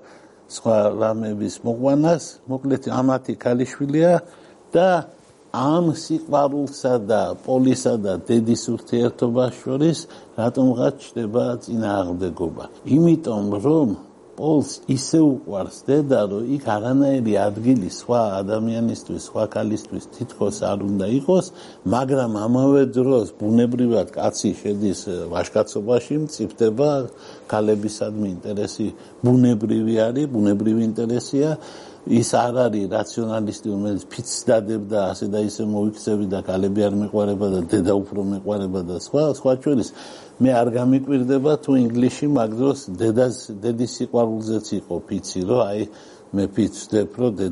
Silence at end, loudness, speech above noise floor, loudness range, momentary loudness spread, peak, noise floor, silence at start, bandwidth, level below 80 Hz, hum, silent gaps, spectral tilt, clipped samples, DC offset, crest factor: 0 s; -21 LUFS; 27 dB; 3 LU; 9 LU; -6 dBFS; -47 dBFS; 0.5 s; 11.5 kHz; -58 dBFS; none; none; -6.5 dB/octave; under 0.1%; under 0.1%; 14 dB